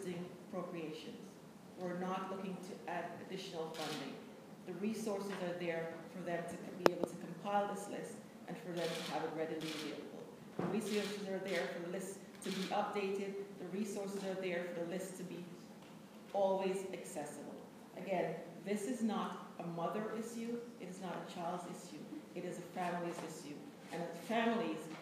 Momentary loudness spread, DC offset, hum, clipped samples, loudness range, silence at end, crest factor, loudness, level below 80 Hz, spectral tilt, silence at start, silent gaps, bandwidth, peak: 12 LU; under 0.1%; none; under 0.1%; 4 LU; 0 s; 34 dB; -42 LUFS; -84 dBFS; -5 dB/octave; 0 s; none; 15.5 kHz; -8 dBFS